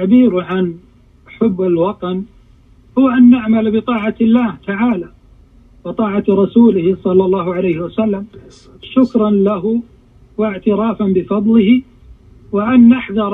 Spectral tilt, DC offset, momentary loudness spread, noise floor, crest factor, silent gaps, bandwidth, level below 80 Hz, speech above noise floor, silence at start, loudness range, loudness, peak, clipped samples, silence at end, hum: -9.5 dB/octave; under 0.1%; 13 LU; -45 dBFS; 14 dB; none; 3.9 kHz; -46 dBFS; 33 dB; 0 s; 3 LU; -14 LUFS; 0 dBFS; under 0.1%; 0 s; none